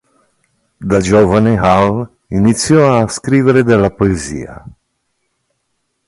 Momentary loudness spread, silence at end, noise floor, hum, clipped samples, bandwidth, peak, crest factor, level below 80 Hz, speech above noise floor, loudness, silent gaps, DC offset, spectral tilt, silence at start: 12 LU; 1.5 s; -67 dBFS; none; under 0.1%; 11.5 kHz; 0 dBFS; 14 dB; -36 dBFS; 56 dB; -12 LUFS; none; under 0.1%; -6 dB/octave; 0.8 s